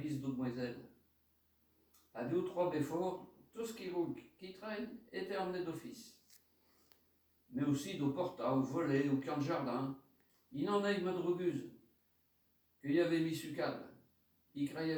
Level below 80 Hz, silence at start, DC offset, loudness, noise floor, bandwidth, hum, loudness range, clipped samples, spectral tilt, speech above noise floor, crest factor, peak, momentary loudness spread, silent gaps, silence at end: -78 dBFS; 0 s; under 0.1%; -39 LUFS; -76 dBFS; over 20 kHz; none; 6 LU; under 0.1%; -6.5 dB/octave; 38 dB; 18 dB; -22 dBFS; 15 LU; none; 0 s